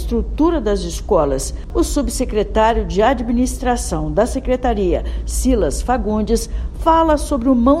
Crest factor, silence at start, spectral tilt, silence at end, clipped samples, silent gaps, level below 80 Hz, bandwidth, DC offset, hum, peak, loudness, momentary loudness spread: 16 dB; 0 s; -5.5 dB/octave; 0 s; under 0.1%; none; -24 dBFS; 14 kHz; under 0.1%; none; 0 dBFS; -18 LUFS; 6 LU